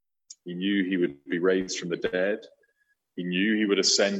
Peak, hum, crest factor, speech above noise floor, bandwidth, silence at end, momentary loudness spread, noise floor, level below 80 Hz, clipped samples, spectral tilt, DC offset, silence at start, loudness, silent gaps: -10 dBFS; none; 18 dB; 47 dB; 8.8 kHz; 0 s; 14 LU; -73 dBFS; -70 dBFS; under 0.1%; -3.5 dB/octave; under 0.1%; 0.3 s; -26 LUFS; none